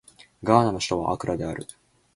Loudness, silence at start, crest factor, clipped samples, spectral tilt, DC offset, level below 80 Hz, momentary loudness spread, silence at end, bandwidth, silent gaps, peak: -24 LUFS; 0.4 s; 24 dB; under 0.1%; -5.5 dB/octave; under 0.1%; -50 dBFS; 15 LU; 0.5 s; 11.5 kHz; none; -2 dBFS